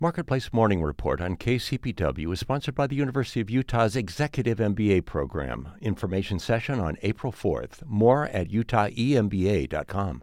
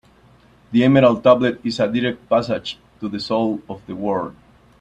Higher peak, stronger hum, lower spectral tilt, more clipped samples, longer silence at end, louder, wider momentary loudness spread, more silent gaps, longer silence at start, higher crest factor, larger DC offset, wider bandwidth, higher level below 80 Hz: second, -8 dBFS vs 0 dBFS; neither; about the same, -7 dB/octave vs -7 dB/octave; neither; second, 0 s vs 0.5 s; second, -26 LUFS vs -19 LUFS; second, 7 LU vs 16 LU; neither; second, 0 s vs 0.7 s; about the same, 18 dB vs 18 dB; neither; first, 15.5 kHz vs 8.8 kHz; first, -42 dBFS vs -54 dBFS